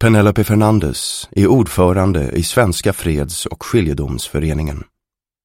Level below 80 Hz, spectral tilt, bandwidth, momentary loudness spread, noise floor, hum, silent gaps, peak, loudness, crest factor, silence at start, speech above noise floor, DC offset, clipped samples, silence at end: -30 dBFS; -6 dB/octave; 16.5 kHz; 9 LU; -81 dBFS; none; none; 0 dBFS; -16 LUFS; 14 dB; 0 s; 67 dB; under 0.1%; under 0.1%; 0.6 s